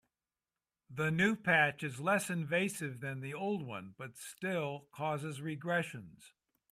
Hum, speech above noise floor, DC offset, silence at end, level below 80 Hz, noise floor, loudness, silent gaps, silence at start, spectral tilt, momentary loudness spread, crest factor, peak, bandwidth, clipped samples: none; over 54 dB; under 0.1%; 0.45 s; -76 dBFS; under -90 dBFS; -35 LUFS; none; 0.9 s; -5 dB/octave; 16 LU; 20 dB; -16 dBFS; 15.5 kHz; under 0.1%